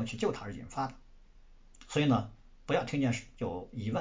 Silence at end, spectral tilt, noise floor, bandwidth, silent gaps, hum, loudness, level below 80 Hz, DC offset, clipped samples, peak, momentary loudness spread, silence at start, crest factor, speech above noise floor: 0 s; -6 dB/octave; -56 dBFS; 7.8 kHz; none; none; -34 LUFS; -56 dBFS; under 0.1%; under 0.1%; -16 dBFS; 12 LU; 0 s; 18 dB; 23 dB